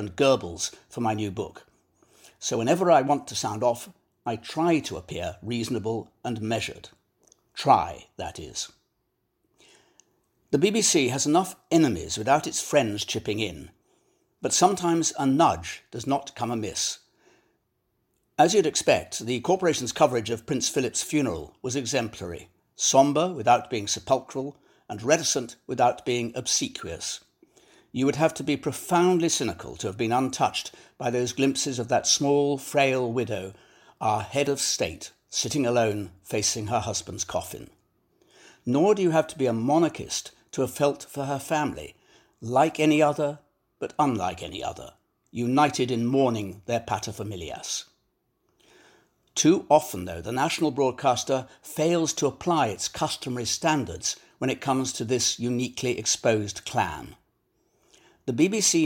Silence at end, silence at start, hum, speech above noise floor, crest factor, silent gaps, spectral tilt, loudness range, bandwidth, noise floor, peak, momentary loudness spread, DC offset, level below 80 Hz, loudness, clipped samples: 0 s; 0 s; none; 50 dB; 20 dB; none; -4 dB/octave; 4 LU; 17 kHz; -75 dBFS; -6 dBFS; 13 LU; under 0.1%; -58 dBFS; -25 LUFS; under 0.1%